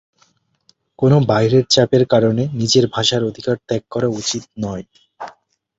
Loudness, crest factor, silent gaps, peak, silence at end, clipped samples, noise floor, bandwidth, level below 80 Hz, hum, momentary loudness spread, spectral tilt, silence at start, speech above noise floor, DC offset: -16 LUFS; 16 dB; none; -2 dBFS; 0.5 s; under 0.1%; -60 dBFS; 8 kHz; -52 dBFS; none; 16 LU; -5 dB/octave; 1 s; 44 dB; under 0.1%